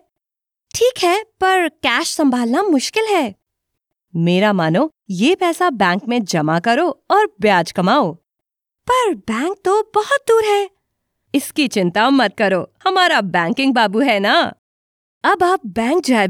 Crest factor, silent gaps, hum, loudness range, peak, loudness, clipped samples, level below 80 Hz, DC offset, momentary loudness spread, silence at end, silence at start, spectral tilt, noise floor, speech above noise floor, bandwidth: 14 dB; 14.59-15.21 s; none; 2 LU; -2 dBFS; -16 LUFS; under 0.1%; -58 dBFS; under 0.1%; 6 LU; 0 s; 0.75 s; -4.5 dB/octave; -86 dBFS; 70 dB; 17 kHz